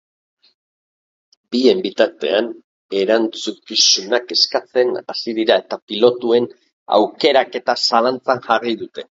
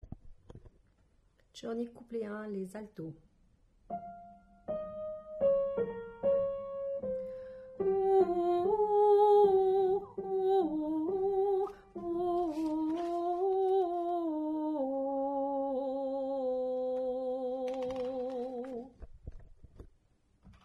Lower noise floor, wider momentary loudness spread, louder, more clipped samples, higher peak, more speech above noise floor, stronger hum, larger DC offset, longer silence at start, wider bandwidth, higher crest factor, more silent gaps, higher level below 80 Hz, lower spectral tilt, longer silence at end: first, under -90 dBFS vs -69 dBFS; second, 10 LU vs 16 LU; first, -17 LUFS vs -32 LUFS; neither; first, 0 dBFS vs -16 dBFS; first, over 73 dB vs 29 dB; neither; neither; first, 1.5 s vs 0.05 s; about the same, 7.8 kHz vs 7.8 kHz; about the same, 18 dB vs 16 dB; first, 2.64-2.89 s, 5.82-5.88 s, 6.73-6.86 s vs none; second, -68 dBFS vs -62 dBFS; second, -2.5 dB/octave vs -8 dB/octave; about the same, 0.15 s vs 0.15 s